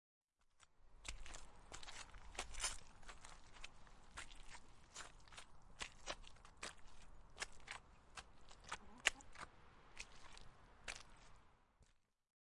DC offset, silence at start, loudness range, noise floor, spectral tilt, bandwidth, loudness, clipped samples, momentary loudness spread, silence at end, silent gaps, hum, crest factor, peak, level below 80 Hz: under 0.1%; 0.55 s; 8 LU; -75 dBFS; -0.5 dB/octave; 11.5 kHz; -52 LUFS; under 0.1%; 19 LU; 0.5 s; none; none; 38 dB; -16 dBFS; -62 dBFS